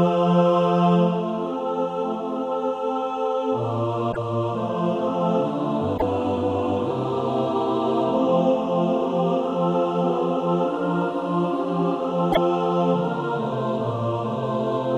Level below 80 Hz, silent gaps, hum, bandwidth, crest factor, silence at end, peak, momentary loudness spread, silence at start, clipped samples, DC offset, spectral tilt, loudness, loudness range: -54 dBFS; none; none; 7.8 kHz; 16 dB; 0 s; -6 dBFS; 7 LU; 0 s; under 0.1%; under 0.1%; -8.5 dB/octave; -23 LUFS; 3 LU